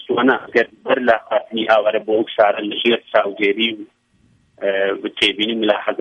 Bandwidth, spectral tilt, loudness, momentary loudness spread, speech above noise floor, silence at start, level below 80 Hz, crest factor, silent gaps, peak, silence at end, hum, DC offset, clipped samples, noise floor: 10 kHz; -4.5 dB/octave; -18 LUFS; 5 LU; 40 dB; 0 s; -62 dBFS; 18 dB; none; -2 dBFS; 0 s; none; under 0.1%; under 0.1%; -57 dBFS